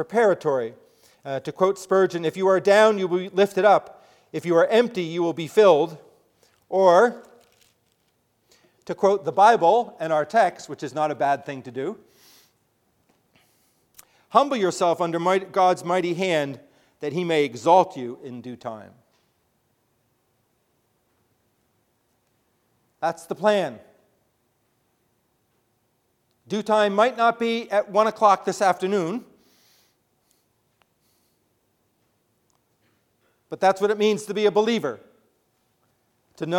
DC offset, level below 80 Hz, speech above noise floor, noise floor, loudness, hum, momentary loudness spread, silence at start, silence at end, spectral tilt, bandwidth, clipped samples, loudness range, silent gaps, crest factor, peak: under 0.1%; -76 dBFS; 49 dB; -70 dBFS; -21 LUFS; none; 17 LU; 0 s; 0 s; -5 dB/octave; 15.5 kHz; under 0.1%; 10 LU; none; 22 dB; -2 dBFS